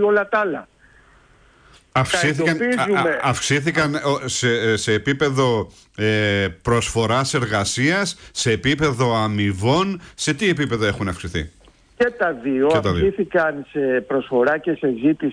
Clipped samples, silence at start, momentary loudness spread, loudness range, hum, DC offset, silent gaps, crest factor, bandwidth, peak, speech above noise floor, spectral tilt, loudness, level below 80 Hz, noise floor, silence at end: under 0.1%; 0 s; 6 LU; 2 LU; none; under 0.1%; none; 12 dB; 10.5 kHz; -6 dBFS; 33 dB; -4.5 dB/octave; -20 LUFS; -44 dBFS; -52 dBFS; 0 s